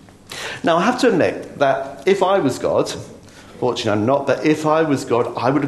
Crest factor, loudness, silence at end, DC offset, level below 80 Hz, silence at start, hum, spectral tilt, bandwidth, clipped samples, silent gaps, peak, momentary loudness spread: 18 dB; -18 LUFS; 0 s; under 0.1%; -56 dBFS; 0.3 s; none; -5.5 dB/octave; 12.5 kHz; under 0.1%; none; -2 dBFS; 10 LU